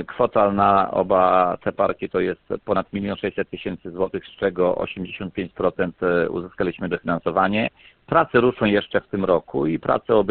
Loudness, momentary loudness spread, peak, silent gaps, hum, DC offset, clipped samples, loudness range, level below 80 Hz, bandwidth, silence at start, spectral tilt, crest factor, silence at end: -22 LUFS; 11 LU; -4 dBFS; none; none; under 0.1%; under 0.1%; 5 LU; -50 dBFS; 4.5 kHz; 0 s; -11 dB/octave; 18 dB; 0 s